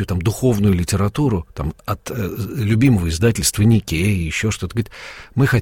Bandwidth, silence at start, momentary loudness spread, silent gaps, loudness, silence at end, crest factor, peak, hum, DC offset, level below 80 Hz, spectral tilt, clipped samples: 16.5 kHz; 0 s; 11 LU; none; -19 LUFS; 0 s; 14 dB; -4 dBFS; none; under 0.1%; -34 dBFS; -5.5 dB/octave; under 0.1%